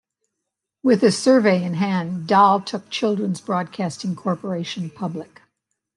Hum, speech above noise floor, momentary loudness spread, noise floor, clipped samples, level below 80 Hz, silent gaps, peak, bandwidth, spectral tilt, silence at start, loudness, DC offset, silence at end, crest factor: none; 62 dB; 12 LU; -81 dBFS; under 0.1%; -70 dBFS; none; -2 dBFS; 11.5 kHz; -6 dB/octave; 0.85 s; -20 LUFS; under 0.1%; 0.75 s; 18 dB